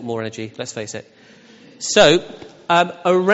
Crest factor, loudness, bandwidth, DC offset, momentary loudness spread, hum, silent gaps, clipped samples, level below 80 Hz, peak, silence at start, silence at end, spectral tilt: 18 dB; -18 LUFS; 8 kHz; under 0.1%; 20 LU; none; none; under 0.1%; -54 dBFS; -2 dBFS; 0 s; 0 s; -2.5 dB/octave